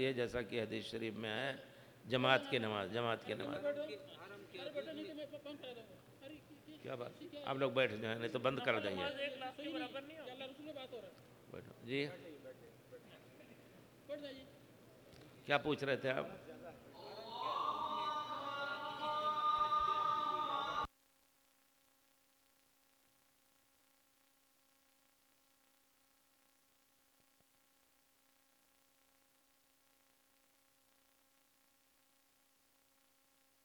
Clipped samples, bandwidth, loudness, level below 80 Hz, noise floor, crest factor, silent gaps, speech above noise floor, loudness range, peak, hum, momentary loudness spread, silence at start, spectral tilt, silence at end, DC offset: under 0.1%; over 20 kHz; -40 LUFS; -74 dBFS; -75 dBFS; 30 dB; none; 34 dB; 11 LU; -16 dBFS; none; 22 LU; 0 s; -5 dB/octave; 12.75 s; under 0.1%